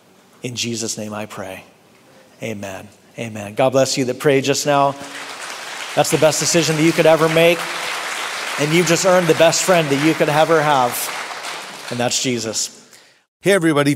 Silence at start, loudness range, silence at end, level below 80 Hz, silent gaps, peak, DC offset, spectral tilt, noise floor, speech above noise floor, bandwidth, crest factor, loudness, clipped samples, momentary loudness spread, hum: 0.45 s; 8 LU; 0 s; -60 dBFS; 13.28-13.40 s; 0 dBFS; under 0.1%; -3.5 dB/octave; -49 dBFS; 32 dB; 16 kHz; 18 dB; -17 LUFS; under 0.1%; 16 LU; none